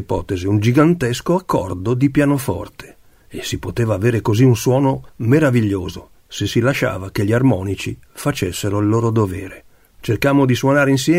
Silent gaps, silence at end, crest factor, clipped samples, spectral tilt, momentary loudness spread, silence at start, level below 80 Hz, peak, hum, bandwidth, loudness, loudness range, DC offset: none; 0 s; 16 dB; under 0.1%; -6.5 dB/octave; 13 LU; 0 s; -42 dBFS; 0 dBFS; none; 16 kHz; -17 LUFS; 2 LU; under 0.1%